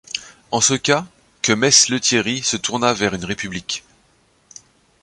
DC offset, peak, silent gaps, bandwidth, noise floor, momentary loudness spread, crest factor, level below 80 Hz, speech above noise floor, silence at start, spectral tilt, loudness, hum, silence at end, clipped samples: under 0.1%; 0 dBFS; none; 11.5 kHz; -58 dBFS; 15 LU; 20 dB; -52 dBFS; 40 dB; 0.15 s; -2 dB/octave; -17 LUFS; none; 1.25 s; under 0.1%